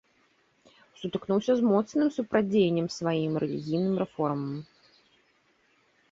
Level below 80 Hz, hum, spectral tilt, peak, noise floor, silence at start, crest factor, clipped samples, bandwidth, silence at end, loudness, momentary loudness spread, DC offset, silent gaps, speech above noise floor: -68 dBFS; none; -7 dB/octave; -12 dBFS; -67 dBFS; 1 s; 16 dB; under 0.1%; 7.8 kHz; 1.5 s; -28 LUFS; 11 LU; under 0.1%; none; 41 dB